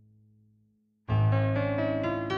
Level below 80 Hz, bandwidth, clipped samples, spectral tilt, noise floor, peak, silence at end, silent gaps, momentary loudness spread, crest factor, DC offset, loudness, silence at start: -52 dBFS; 5.6 kHz; under 0.1%; -9 dB/octave; -69 dBFS; -16 dBFS; 0 s; none; 6 LU; 14 dB; under 0.1%; -28 LUFS; 1.1 s